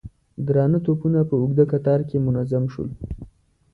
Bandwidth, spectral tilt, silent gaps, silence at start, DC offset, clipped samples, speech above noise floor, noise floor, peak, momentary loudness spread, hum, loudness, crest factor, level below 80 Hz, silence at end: 4.4 kHz; -12 dB/octave; none; 0.05 s; under 0.1%; under 0.1%; 28 dB; -48 dBFS; -6 dBFS; 15 LU; none; -21 LUFS; 16 dB; -44 dBFS; 0.45 s